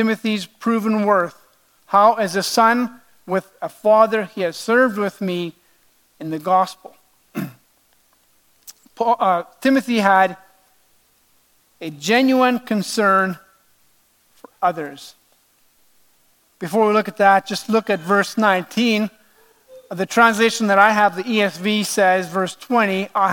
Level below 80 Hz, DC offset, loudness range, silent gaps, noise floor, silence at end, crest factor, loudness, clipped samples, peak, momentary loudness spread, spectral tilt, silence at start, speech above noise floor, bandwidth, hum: -72 dBFS; under 0.1%; 8 LU; none; -60 dBFS; 0 s; 20 dB; -18 LUFS; under 0.1%; 0 dBFS; 14 LU; -4.5 dB/octave; 0 s; 42 dB; 17.5 kHz; none